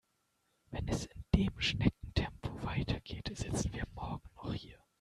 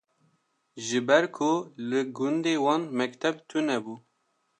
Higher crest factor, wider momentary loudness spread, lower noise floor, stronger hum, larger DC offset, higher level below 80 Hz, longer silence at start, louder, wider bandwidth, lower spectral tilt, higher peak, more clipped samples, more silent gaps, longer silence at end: first, 26 dB vs 20 dB; first, 12 LU vs 9 LU; first, -79 dBFS vs -74 dBFS; neither; neither; first, -46 dBFS vs -80 dBFS; about the same, 0.7 s vs 0.75 s; second, -37 LUFS vs -27 LUFS; first, 13 kHz vs 10 kHz; about the same, -5.5 dB/octave vs -4.5 dB/octave; second, -12 dBFS vs -8 dBFS; neither; neither; second, 0.25 s vs 0.6 s